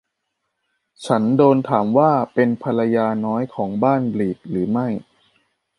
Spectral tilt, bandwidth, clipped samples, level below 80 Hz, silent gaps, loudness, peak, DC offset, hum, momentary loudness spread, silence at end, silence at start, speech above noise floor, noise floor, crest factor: -8 dB/octave; 11 kHz; under 0.1%; -60 dBFS; none; -19 LUFS; -2 dBFS; under 0.1%; none; 9 LU; 0.75 s; 1 s; 58 dB; -76 dBFS; 18 dB